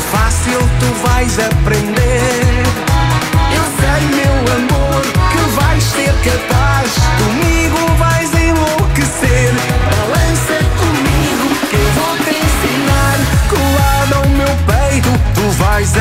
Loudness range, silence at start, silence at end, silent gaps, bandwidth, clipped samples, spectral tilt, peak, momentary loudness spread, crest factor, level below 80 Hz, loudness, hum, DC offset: 1 LU; 0 s; 0 s; none; 16.5 kHz; under 0.1%; -5 dB/octave; 0 dBFS; 2 LU; 10 dB; -18 dBFS; -12 LUFS; none; under 0.1%